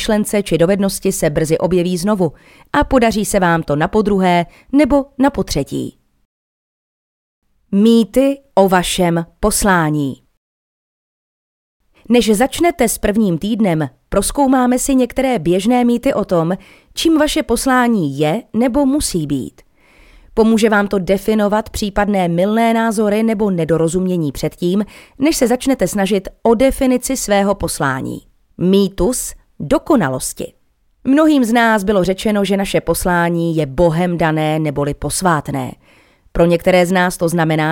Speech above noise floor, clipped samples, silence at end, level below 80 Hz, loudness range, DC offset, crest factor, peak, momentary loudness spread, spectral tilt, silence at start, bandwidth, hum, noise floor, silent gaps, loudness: 36 dB; under 0.1%; 0 s; -36 dBFS; 3 LU; under 0.1%; 14 dB; 0 dBFS; 8 LU; -5 dB/octave; 0 s; 17 kHz; none; -50 dBFS; 6.25-7.42 s, 10.37-11.80 s; -15 LUFS